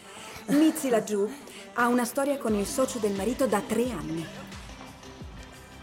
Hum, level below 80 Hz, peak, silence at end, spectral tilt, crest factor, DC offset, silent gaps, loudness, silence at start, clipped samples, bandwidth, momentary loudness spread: none; -52 dBFS; -12 dBFS; 0 s; -4.5 dB/octave; 16 dB; under 0.1%; none; -27 LUFS; 0 s; under 0.1%; 16.5 kHz; 20 LU